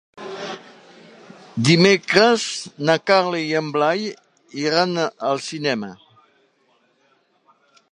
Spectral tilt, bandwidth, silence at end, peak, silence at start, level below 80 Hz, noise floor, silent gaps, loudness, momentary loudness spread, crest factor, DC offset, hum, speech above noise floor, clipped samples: -4.5 dB/octave; 11.5 kHz; 1.95 s; -2 dBFS; 0.15 s; -66 dBFS; -62 dBFS; none; -19 LUFS; 18 LU; 20 dB; under 0.1%; none; 43 dB; under 0.1%